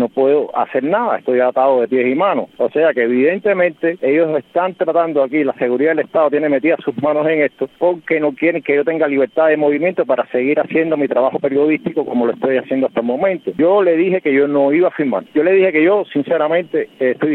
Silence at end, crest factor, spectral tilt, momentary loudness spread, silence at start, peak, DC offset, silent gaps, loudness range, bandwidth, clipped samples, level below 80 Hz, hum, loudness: 0 s; 12 dB; -9 dB/octave; 5 LU; 0 s; -2 dBFS; under 0.1%; none; 2 LU; 4.2 kHz; under 0.1%; -66 dBFS; none; -15 LUFS